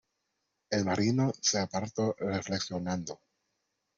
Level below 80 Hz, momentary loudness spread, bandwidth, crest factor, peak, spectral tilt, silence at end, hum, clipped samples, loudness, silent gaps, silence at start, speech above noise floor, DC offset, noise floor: -68 dBFS; 8 LU; 7.8 kHz; 18 dB; -16 dBFS; -4.5 dB/octave; 0.85 s; none; under 0.1%; -31 LUFS; none; 0.7 s; 51 dB; under 0.1%; -82 dBFS